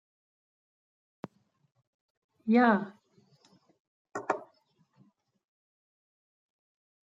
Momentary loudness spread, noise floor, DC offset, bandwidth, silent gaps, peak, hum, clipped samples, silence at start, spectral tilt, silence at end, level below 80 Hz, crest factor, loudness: 25 LU; -70 dBFS; under 0.1%; 7.8 kHz; 3.80-4.05 s; -10 dBFS; none; under 0.1%; 2.45 s; -7 dB/octave; 2.65 s; -86 dBFS; 26 dB; -29 LUFS